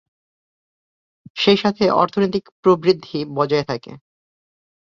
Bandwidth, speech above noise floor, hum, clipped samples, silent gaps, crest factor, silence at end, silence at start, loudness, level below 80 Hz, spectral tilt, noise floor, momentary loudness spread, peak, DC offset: 7.2 kHz; over 72 dB; none; under 0.1%; 2.52-2.63 s; 20 dB; 0.9 s; 1.35 s; -18 LUFS; -58 dBFS; -6.5 dB/octave; under -90 dBFS; 11 LU; -2 dBFS; under 0.1%